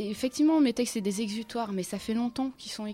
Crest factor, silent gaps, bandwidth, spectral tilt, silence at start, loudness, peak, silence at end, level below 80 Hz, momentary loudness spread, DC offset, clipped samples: 14 dB; none; 15.5 kHz; -4.5 dB/octave; 0 s; -29 LUFS; -16 dBFS; 0 s; -62 dBFS; 10 LU; under 0.1%; under 0.1%